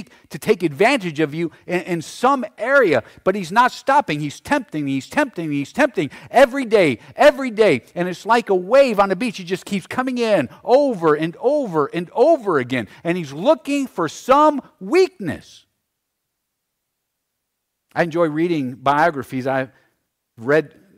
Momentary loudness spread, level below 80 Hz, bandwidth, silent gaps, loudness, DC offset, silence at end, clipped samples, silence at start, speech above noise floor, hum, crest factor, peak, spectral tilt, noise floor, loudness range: 10 LU; -56 dBFS; 16 kHz; none; -19 LUFS; under 0.1%; 0.3 s; under 0.1%; 0 s; 59 dB; none; 14 dB; -4 dBFS; -5.5 dB/octave; -77 dBFS; 5 LU